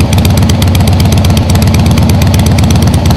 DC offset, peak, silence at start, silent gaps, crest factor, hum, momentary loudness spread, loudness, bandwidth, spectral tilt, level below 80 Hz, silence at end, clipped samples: under 0.1%; 0 dBFS; 0 s; none; 6 dB; none; 1 LU; -7 LUFS; 16 kHz; -6 dB/octave; -16 dBFS; 0 s; under 0.1%